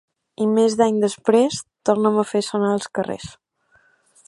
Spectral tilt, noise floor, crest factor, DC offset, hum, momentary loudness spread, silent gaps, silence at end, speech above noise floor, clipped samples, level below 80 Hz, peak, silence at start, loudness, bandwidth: -5 dB/octave; -60 dBFS; 20 dB; under 0.1%; none; 9 LU; none; 0.95 s; 41 dB; under 0.1%; -62 dBFS; -2 dBFS; 0.4 s; -20 LUFS; 11.5 kHz